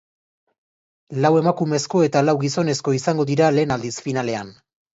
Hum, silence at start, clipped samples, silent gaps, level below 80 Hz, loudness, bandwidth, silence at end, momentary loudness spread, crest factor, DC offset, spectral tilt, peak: none; 1.1 s; under 0.1%; none; -60 dBFS; -20 LUFS; 8 kHz; 0.45 s; 9 LU; 16 dB; under 0.1%; -6 dB/octave; -4 dBFS